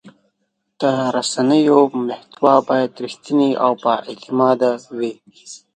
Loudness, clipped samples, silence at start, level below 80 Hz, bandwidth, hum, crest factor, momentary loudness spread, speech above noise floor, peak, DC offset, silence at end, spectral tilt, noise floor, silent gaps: -17 LUFS; under 0.1%; 0.05 s; -70 dBFS; 9.6 kHz; none; 18 dB; 12 LU; 54 dB; 0 dBFS; under 0.1%; 0.2 s; -5 dB/octave; -71 dBFS; none